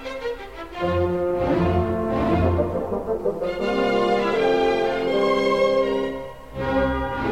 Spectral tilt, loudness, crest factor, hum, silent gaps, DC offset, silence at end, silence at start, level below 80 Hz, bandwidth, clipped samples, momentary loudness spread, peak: -7 dB/octave; -22 LUFS; 16 dB; none; none; 0.5%; 0 s; 0 s; -38 dBFS; 15.5 kHz; under 0.1%; 10 LU; -6 dBFS